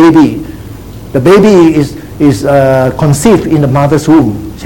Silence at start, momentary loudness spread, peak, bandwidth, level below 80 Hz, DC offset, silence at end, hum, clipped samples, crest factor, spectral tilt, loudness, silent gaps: 0 s; 15 LU; 0 dBFS; 17.5 kHz; -30 dBFS; 0.8%; 0 s; none; 3%; 8 dB; -7 dB/octave; -7 LUFS; none